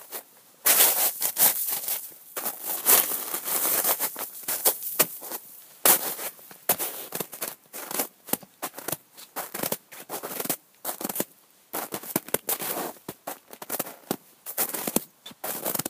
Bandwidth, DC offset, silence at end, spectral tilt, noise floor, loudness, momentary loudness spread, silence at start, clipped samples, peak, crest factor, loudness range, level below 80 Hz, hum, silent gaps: 16 kHz; under 0.1%; 0 s; -1 dB/octave; -55 dBFS; -25 LUFS; 17 LU; 0 s; under 0.1%; 0 dBFS; 28 dB; 11 LU; -76 dBFS; none; none